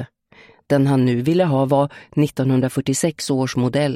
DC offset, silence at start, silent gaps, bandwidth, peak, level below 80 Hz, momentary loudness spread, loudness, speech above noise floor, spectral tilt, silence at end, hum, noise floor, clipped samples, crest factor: under 0.1%; 0 s; none; 15.5 kHz; -4 dBFS; -56 dBFS; 5 LU; -19 LUFS; 32 dB; -6.5 dB/octave; 0 s; none; -50 dBFS; under 0.1%; 16 dB